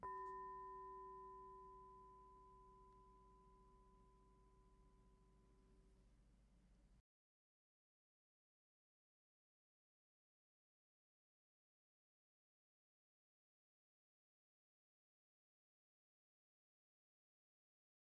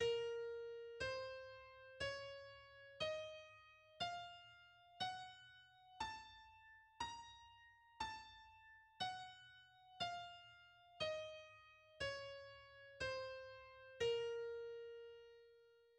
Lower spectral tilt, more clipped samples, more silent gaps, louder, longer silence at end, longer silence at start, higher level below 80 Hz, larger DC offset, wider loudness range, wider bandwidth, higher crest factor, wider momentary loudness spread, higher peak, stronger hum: first, -5.5 dB/octave vs -2.5 dB/octave; neither; neither; second, -58 LUFS vs -49 LUFS; first, 11.1 s vs 0 s; about the same, 0 s vs 0 s; about the same, -78 dBFS vs -74 dBFS; neither; first, 11 LU vs 5 LU; second, 4.9 kHz vs 10.5 kHz; about the same, 24 dB vs 20 dB; second, 15 LU vs 19 LU; second, -42 dBFS vs -32 dBFS; neither